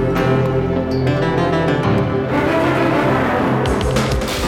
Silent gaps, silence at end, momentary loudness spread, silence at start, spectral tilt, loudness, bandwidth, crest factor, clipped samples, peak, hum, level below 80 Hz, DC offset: none; 0 s; 3 LU; 0 s; -6.5 dB/octave; -17 LUFS; 16.5 kHz; 12 dB; under 0.1%; -4 dBFS; none; -32 dBFS; under 0.1%